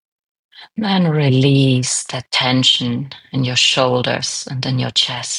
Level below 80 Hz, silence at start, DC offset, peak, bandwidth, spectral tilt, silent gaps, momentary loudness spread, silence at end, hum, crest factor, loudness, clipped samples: -58 dBFS; 0.6 s; under 0.1%; -2 dBFS; 11.5 kHz; -4 dB/octave; none; 9 LU; 0 s; none; 16 dB; -16 LUFS; under 0.1%